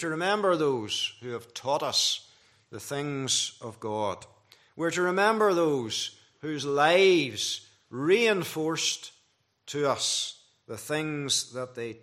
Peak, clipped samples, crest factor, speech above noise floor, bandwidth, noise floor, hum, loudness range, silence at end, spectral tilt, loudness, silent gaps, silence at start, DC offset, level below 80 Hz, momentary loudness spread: -8 dBFS; under 0.1%; 20 dB; 42 dB; 15.5 kHz; -70 dBFS; none; 5 LU; 0.05 s; -3 dB/octave; -27 LUFS; none; 0 s; under 0.1%; -76 dBFS; 15 LU